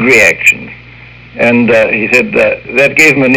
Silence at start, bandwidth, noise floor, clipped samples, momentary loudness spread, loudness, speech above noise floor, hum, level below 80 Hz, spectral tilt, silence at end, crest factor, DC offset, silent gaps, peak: 0 s; over 20 kHz; -33 dBFS; 3%; 9 LU; -8 LUFS; 25 dB; 60 Hz at -25 dBFS; -42 dBFS; -4 dB/octave; 0 s; 10 dB; under 0.1%; none; 0 dBFS